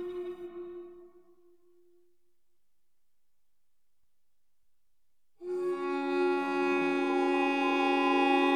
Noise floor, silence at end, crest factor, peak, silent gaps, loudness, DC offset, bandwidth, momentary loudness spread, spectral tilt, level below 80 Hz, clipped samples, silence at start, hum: -86 dBFS; 0 s; 18 dB; -16 dBFS; none; -29 LUFS; under 0.1%; 10 kHz; 17 LU; -4.5 dB/octave; -78 dBFS; under 0.1%; 0 s; none